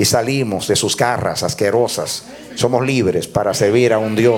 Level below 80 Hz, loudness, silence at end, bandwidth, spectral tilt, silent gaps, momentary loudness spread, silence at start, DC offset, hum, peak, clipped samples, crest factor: -48 dBFS; -17 LUFS; 0 s; 18 kHz; -4.5 dB/octave; none; 6 LU; 0 s; under 0.1%; none; -2 dBFS; under 0.1%; 14 dB